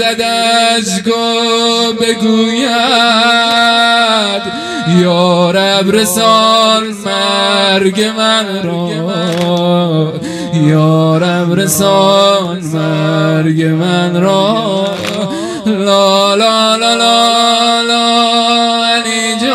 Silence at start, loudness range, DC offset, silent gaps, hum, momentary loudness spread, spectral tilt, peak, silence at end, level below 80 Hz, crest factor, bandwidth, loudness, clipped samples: 0 s; 3 LU; under 0.1%; none; none; 8 LU; -4 dB/octave; 0 dBFS; 0 s; -56 dBFS; 10 dB; 14.5 kHz; -10 LUFS; 0.3%